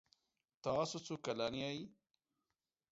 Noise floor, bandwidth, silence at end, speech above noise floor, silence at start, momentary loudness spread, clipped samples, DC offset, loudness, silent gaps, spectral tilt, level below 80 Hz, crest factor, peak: under -90 dBFS; 7.6 kHz; 1 s; over 49 dB; 0.65 s; 9 LU; under 0.1%; under 0.1%; -42 LUFS; none; -4 dB/octave; -74 dBFS; 20 dB; -24 dBFS